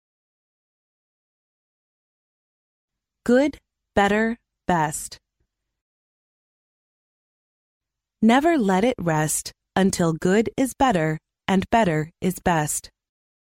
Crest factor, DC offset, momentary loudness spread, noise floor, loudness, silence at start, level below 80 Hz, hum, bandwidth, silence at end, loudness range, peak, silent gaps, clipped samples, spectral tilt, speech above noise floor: 18 dB; under 0.1%; 8 LU; -76 dBFS; -22 LUFS; 3.25 s; -50 dBFS; none; 16 kHz; 0.75 s; 8 LU; -6 dBFS; 5.82-7.80 s; under 0.1%; -5 dB/octave; 55 dB